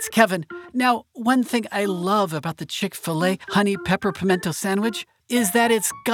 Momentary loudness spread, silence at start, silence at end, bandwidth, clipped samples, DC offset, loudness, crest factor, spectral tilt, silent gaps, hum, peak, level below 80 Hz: 8 LU; 0 s; 0 s; 19 kHz; under 0.1%; under 0.1%; -22 LUFS; 22 dB; -4 dB/octave; none; none; 0 dBFS; -60 dBFS